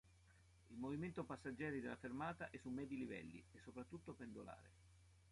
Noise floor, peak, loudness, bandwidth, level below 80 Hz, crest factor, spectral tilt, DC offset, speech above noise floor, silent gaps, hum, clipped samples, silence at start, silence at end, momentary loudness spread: -71 dBFS; -34 dBFS; -51 LUFS; 11.5 kHz; -72 dBFS; 18 dB; -7 dB/octave; under 0.1%; 20 dB; none; none; under 0.1%; 0.05 s; 0 s; 12 LU